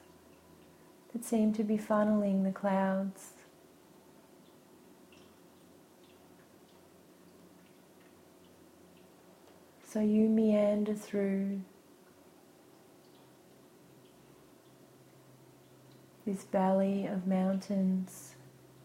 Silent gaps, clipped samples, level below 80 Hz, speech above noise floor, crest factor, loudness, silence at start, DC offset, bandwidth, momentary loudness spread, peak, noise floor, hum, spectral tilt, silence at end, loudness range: none; under 0.1%; -76 dBFS; 29 dB; 18 dB; -32 LUFS; 1.15 s; under 0.1%; 15.5 kHz; 16 LU; -18 dBFS; -60 dBFS; none; -7.5 dB/octave; 0.55 s; 10 LU